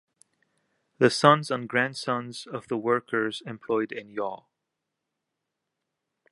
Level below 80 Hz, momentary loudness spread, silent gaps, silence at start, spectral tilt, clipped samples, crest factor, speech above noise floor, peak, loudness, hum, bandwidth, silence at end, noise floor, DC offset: -76 dBFS; 15 LU; none; 1 s; -5 dB/octave; under 0.1%; 26 dB; 58 dB; -2 dBFS; -26 LUFS; none; 11.5 kHz; 1.95 s; -84 dBFS; under 0.1%